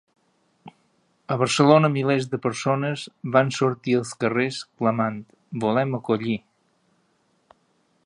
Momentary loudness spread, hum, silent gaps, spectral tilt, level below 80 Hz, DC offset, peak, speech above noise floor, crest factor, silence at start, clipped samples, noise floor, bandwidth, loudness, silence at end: 12 LU; none; none; -6 dB/octave; -68 dBFS; under 0.1%; -2 dBFS; 45 dB; 24 dB; 0.65 s; under 0.1%; -67 dBFS; 11.5 kHz; -23 LUFS; 1.65 s